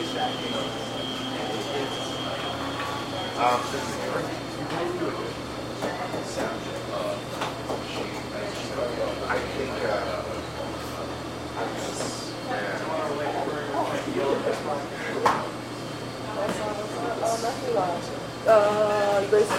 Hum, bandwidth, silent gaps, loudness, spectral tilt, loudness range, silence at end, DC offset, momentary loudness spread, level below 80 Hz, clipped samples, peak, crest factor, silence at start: none; 16 kHz; none; -28 LUFS; -4.5 dB/octave; 4 LU; 0 s; under 0.1%; 9 LU; -52 dBFS; under 0.1%; -6 dBFS; 20 dB; 0 s